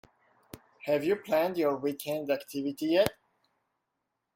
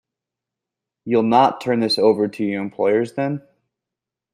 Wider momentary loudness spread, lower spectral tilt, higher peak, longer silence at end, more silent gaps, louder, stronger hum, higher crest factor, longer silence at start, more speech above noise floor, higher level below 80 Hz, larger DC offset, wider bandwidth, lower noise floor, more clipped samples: about the same, 7 LU vs 9 LU; about the same, -5 dB/octave vs -6 dB/octave; second, -6 dBFS vs -2 dBFS; first, 1.25 s vs 0.95 s; neither; second, -30 LUFS vs -19 LUFS; neither; first, 26 dB vs 18 dB; second, 0.55 s vs 1.05 s; second, 54 dB vs 68 dB; about the same, -66 dBFS vs -68 dBFS; neither; first, 16.5 kHz vs 14.5 kHz; about the same, -83 dBFS vs -86 dBFS; neither